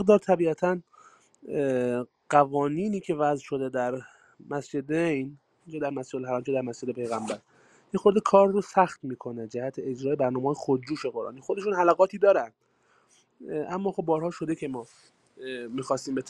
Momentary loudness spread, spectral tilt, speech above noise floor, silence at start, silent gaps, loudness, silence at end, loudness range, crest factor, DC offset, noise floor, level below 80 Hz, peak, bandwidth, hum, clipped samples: 14 LU; -6.5 dB/octave; 39 dB; 0 s; none; -27 LUFS; 0 s; 6 LU; 22 dB; under 0.1%; -66 dBFS; -70 dBFS; -4 dBFS; 11 kHz; none; under 0.1%